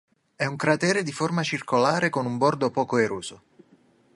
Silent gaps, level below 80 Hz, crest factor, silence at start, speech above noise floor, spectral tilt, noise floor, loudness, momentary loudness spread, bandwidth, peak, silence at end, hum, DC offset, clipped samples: none; -66 dBFS; 20 dB; 0.4 s; 35 dB; -5 dB/octave; -59 dBFS; -24 LUFS; 7 LU; 11.5 kHz; -6 dBFS; 0.8 s; none; under 0.1%; under 0.1%